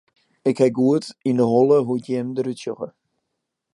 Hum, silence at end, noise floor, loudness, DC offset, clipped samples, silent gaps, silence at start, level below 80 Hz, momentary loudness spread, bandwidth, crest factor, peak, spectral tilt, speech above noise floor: none; 0.85 s; -79 dBFS; -20 LUFS; under 0.1%; under 0.1%; none; 0.45 s; -70 dBFS; 13 LU; 11.5 kHz; 16 dB; -6 dBFS; -7.5 dB/octave; 59 dB